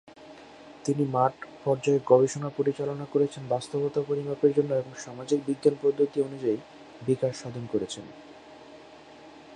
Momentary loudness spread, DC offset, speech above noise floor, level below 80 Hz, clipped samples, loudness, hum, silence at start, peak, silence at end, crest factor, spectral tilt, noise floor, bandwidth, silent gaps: 24 LU; under 0.1%; 22 dB; -68 dBFS; under 0.1%; -27 LUFS; none; 0.05 s; -6 dBFS; 0 s; 22 dB; -6.5 dB/octave; -49 dBFS; 10.5 kHz; none